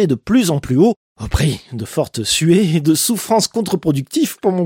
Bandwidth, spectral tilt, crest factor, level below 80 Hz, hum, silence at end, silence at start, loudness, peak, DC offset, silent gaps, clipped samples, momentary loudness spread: 17 kHz; -5 dB/octave; 14 dB; -34 dBFS; none; 0 s; 0 s; -16 LUFS; -2 dBFS; under 0.1%; 0.96-1.16 s; under 0.1%; 8 LU